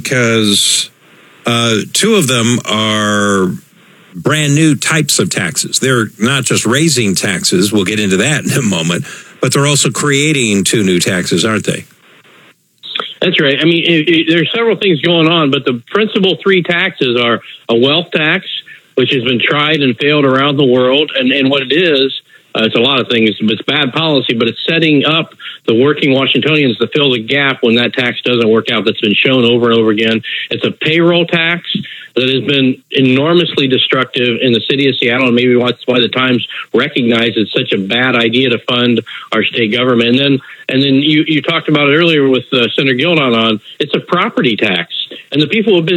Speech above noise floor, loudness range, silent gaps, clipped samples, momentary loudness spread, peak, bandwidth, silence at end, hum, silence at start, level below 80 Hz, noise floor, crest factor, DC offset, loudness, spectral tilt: 34 dB; 2 LU; none; under 0.1%; 6 LU; 0 dBFS; 18.5 kHz; 0 s; none; 0 s; -62 dBFS; -46 dBFS; 12 dB; under 0.1%; -11 LUFS; -4 dB/octave